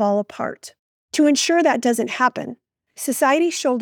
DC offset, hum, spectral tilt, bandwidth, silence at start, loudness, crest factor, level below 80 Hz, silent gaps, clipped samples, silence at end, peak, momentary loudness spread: under 0.1%; none; -3 dB/octave; over 20 kHz; 0 s; -19 LUFS; 16 dB; -76 dBFS; 0.79-1.08 s; under 0.1%; 0 s; -4 dBFS; 12 LU